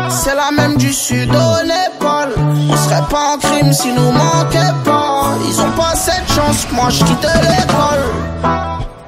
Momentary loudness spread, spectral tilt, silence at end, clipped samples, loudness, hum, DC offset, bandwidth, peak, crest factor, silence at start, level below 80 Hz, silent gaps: 4 LU; -4.5 dB/octave; 0 s; under 0.1%; -13 LUFS; none; under 0.1%; 16 kHz; 0 dBFS; 12 dB; 0 s; -30 dBFS; none